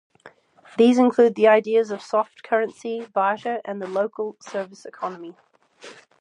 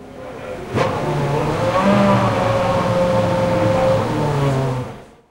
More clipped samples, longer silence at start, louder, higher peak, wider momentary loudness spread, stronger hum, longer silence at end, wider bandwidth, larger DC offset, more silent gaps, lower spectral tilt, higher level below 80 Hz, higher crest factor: neither; first, 0.25 s vs 0 s; second, -22 LUFS vs -18 LUFS; about the same, -4 dBFS vs -2 dBFS; first, 16 LU vs 13 LU; neither; about the same, 0.3 s vs 0.25 s; second, 10 kHz vs 16 kHz; neither; neither; second, -5.5 dB/octave vs -7 dB/octave; second, -78 dBFS vs -38 dBFS; about the same, 18 dB vs 16 dB